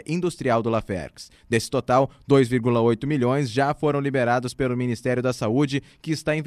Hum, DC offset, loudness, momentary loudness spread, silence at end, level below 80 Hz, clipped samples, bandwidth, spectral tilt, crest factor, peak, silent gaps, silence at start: none; under 0.1%; -23 LUFS; 7 LU; 0 s; -52 dBFS; under 0.1%; 14 kHz; -6.5 dB/octave; 18 dB; -4 dBFS; none; 0.1 s